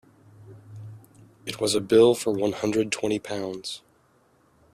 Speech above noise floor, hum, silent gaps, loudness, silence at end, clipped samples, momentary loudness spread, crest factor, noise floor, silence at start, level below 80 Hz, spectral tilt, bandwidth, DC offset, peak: 39 dB; none; none; -24 LUFS; 0.95 s; under 0.1%; 25 LU; 20 dB; -62 dBFS; 0.4 s; -64 dBFS; -4.5 dB/octave; 14.5 kHz; under 0.1%; -6 dBFS